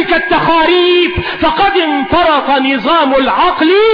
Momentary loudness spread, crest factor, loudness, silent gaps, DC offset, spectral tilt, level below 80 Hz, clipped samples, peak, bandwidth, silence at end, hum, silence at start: 4 LU; 8 dB; -10 LUFS; none; under 0.1%; -7 dB/octave; -34 dBFS; under 0.1%; -2 dBFS; 5.2 kHz; 0 s; none; 0 s